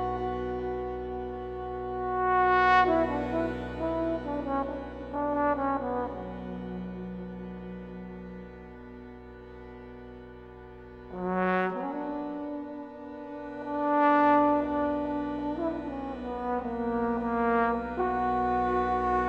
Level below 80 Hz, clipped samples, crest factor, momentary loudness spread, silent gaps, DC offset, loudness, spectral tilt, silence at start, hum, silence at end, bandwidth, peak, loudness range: -48 dBFS; under 0.1%; 20 dB; 22 LU; none; under 0.1%; -29 LUFS; -8 dB/octave; 0 s; none; 0 s; 7.8 kHz; -10 dBFS; 14 LU